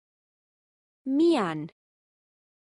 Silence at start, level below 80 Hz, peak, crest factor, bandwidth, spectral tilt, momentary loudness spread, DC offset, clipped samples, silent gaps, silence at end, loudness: 1.05 s; -78 dBFS; -14 dBFS; 16 dB; 11 kHz; -6.5 dB/octave; 17 LU; under 0.1%; under 0.1%; none; 1.05 s; -25 LUFS